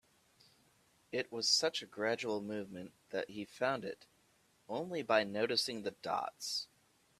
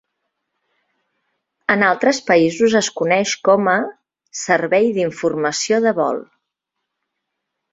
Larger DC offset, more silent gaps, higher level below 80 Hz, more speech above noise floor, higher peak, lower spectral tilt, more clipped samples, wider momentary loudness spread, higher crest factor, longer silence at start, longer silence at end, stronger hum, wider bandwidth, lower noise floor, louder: neither; neither; second, -80 dBFS vs -62 dBFS; second, 34 dB vs 62 dB; second, -16 dBFS vs -2 dBFS; second, -2.5 dB/octave vs -4 dB/octave; neither; first, 14 LU vs 8 LU; first, 24 dB vs 18 dB; second, 1.1 s vs 1.7 s; second, 0.55 s vs 1.5 s; neither; first, 15 kHz vs 8 kHz; second, -72 dBFS vs -79 dBFS; second, -37 LUFS vs -17 LUFS